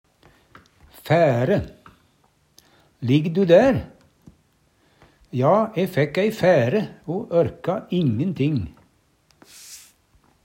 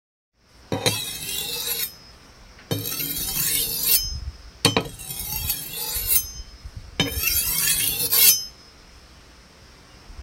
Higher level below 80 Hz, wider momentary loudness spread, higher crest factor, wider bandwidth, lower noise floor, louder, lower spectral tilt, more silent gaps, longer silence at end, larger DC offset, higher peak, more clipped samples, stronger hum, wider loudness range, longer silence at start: second, -52 dBFS vs -42 dBFS; first, 23 LU vs 15 LU; about the same, 20 dB vs 24 dB; about the same, 16 kHz vs 16.5 kHz; first, -62 dBFS vs -49 dBFS; about the same, -21 LUFS vs -21 LUFS; first, -7.5 dB/octave vs -1.5 dB/octave; neither; first, 0.65 s vs 0 s; neither; about the same, -2 dBFS vs 0 dBFS; neither; neither; about the same, 5 LU vs 5 LU; first, 1.05 s vs 0.65 s